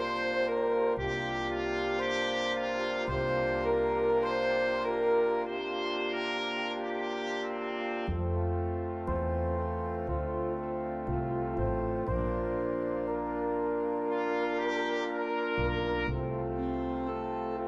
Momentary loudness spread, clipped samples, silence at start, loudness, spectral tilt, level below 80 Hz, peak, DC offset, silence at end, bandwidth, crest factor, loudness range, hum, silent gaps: 5 LU; under 0.1%; 0 s; -31 LUFS; -6.5 dB/octave; -44 dBFS; -18 dBFS; under 0.1%; 0 s; 8.2 kHz; 14 dB; 4 LU; none; none